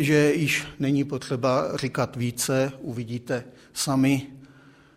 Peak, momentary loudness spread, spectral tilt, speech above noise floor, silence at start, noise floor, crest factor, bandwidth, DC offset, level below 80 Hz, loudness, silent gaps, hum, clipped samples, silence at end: -8 dBFS; 11 LU; -5 dB/octave; 28 dB; 0 s; -52 dBFS; 18 dB; 16 kHz; under 0.1%; -58 dBFS; -25 LUFS; none; none; under 0.1%; 0.5 s